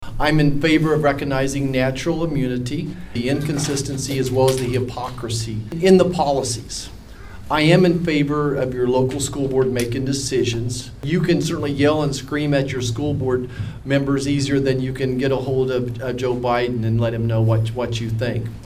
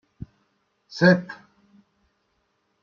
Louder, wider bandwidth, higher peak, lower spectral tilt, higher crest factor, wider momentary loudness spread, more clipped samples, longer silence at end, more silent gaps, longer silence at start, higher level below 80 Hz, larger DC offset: about the same, -20 LUFS vs -20 LUFS; first, 16 kHz vs 7 kHz; about the same, -2 dBFS vs -4 dBFS; about the same, -6 dB/octave vs -7 dB/octave; about the same, 18 dB vs 22 dB; second, 9 LU vs 26 LU; neither; second, 0 s vs 1.5 s; neither; second, 0 s vs 0.95 s; first, -38 dBFS vs -60 dBFS; neither